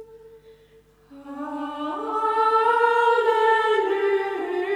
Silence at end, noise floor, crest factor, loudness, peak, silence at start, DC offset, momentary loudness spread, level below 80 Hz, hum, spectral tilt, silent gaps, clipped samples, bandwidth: 0 s; -55 dBFS; 14 dB; -21 LUFS; -8 dBFS; 0 s; under 0.1%; 13 LU; -66 dBFS; 50 Hz at -65 dBFS; -3.5 dB/octave; none; under 0.1%; 10.5 kHz